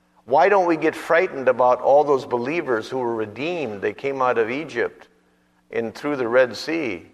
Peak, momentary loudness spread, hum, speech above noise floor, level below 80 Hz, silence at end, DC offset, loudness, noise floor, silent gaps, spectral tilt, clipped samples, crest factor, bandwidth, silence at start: -4 dBFS; 10 LU; none; 41 dB; -66 dBFS; 0.1 s; under 0.1%; -21 LUFS; -61 dBFS; none; -5.5 dB/octave; under 0.1%; 16 dB; 13 kHz; 0.25 s